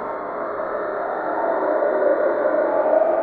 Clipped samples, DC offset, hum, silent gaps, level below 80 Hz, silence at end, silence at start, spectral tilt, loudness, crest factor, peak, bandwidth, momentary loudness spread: under 0.1%; under 0.1%; none; none; -62 dBFS; 0 s; 0 s; -9 dB/octave; -21 LUFS; 16 dB; -6 dBFS; 4.5 kHz; 8 LU